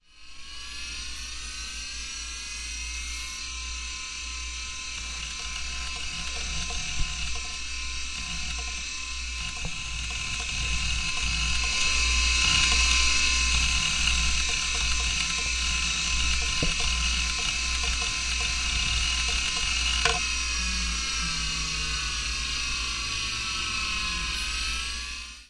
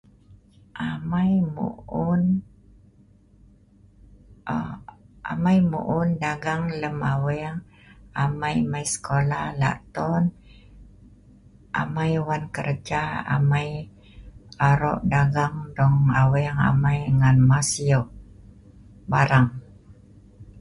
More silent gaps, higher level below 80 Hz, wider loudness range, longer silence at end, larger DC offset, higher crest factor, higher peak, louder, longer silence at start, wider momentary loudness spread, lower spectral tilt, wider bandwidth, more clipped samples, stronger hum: neither; first, -34 dBFS vs -46 dBFS; first, 11 LU vs 7 LU; about the same, 0.05 s vs 0 s; neither; about the same, 22 dB vs 18 dB; about the same, -6 dBFS vs -6 dBFS; second, -26 LUFS vs -23 LUFS; second, 0.15 s vs 0.75 s; about the same, 11 LU vs 13 LU; second, -0.5 dB/octave vs -6.5 dB/octave; about the same, 11.5 kHz vs 11.5 kHz; neither; neither